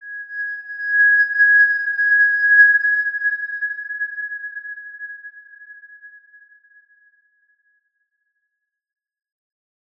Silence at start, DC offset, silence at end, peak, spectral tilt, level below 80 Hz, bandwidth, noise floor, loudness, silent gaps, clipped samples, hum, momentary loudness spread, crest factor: 0 s; under 0.1%; 3.9 s; -2 dBFS; 2 dB/octave; -88 dBFS; 5.2 kHz; -78 dBFS; -15 LUFS; none; under 0.1%; none; 21 LU; 18 dB